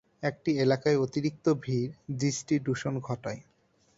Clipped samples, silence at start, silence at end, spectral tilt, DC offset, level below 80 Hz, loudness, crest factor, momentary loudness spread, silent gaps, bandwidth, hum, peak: under 0.1%; 0.2 s; 0.55 s; -6 dB/octave; under 0.1%; -64 dBFS; -30 LUFS; 18 dB; 10 LU; none; 8 kHz; none; -12 dBFS